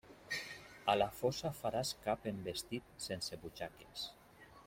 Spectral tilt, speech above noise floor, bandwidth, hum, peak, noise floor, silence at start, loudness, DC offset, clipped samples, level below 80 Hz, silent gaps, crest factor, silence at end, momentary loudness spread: -4 dB/octave; 21 dB; 16.5 kHz; none; -16 dBFS; -61 dBFS; 0.05 s; -40 LUFS; under 0.1%; under 0.1%; -66 dBFS; none; 24 dB; 0 s; 13 LU